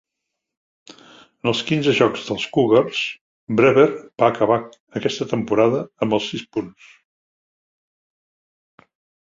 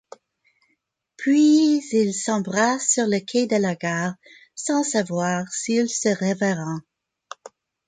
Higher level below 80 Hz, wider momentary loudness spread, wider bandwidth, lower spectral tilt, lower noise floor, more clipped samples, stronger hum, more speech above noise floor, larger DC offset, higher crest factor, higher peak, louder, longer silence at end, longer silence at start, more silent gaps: first, -60 dBFS vs -68 dBFS; second, 11 LU vs 16 LU; second, 7.8 kHz vs 9.6 kHz; first, -5.5 dB/octave vs -4 dB/octave; first, -81 dBFS vs -72 dBFS; neither; neither; first, 62 dB vs 51 dB; neither; about the same, 20 dB vs 16 dB; first, -2 dBFS vs -8 dBFS; about the same, -19 LUFS vs -21 LUFS; first, 2.55 s vs 0.4 s; first, 1.45 s vs 1.2 s; first, 3.21-3.47 s, 4.80-4.87 s vs none